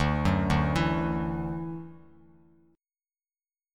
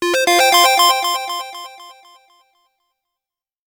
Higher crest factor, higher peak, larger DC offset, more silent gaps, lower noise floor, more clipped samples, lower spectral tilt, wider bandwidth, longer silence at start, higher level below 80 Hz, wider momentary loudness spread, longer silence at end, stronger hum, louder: about the same, 18 dB vs 18 dB; second, -12 dBFS vs 0 dBFS; neither; neither; about the same, under -90 dBFS vs -87 dBFS; neither; first, -7 dB/octave vs 1 dB/octave; second, 12 kHz vs over 20 kHz; about the same, 0 s vs 0 s; first, -40 dBFS vs -66 dBFS; second, 14 LU vs 21 LU; about the same, 1.75 s vs 1.85 s; neither; second, -28 LUFS vs -13 LUFS